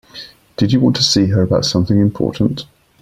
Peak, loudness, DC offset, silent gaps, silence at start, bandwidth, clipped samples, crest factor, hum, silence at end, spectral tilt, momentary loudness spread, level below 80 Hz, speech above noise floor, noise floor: 0 dBFS; -15 LUFS; under 0.1%; none; 0.15 s; 14 kHz; under 0.1%; 16 dB; none; 0.35 s; -5.5 dB/octave; 17 LU; -42 dBFS; 23 dB; -37 dBFS